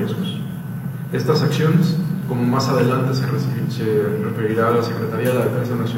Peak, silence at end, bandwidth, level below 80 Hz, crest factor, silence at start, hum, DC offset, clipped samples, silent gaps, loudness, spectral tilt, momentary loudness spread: -4 dBFS; 0 s; 16.5 kHz; -54 dBFS; 14 dB; 0 s; none; under 0.1%; under 0.1%; none; -20 LUFS; -7 dB/octave; 8 LU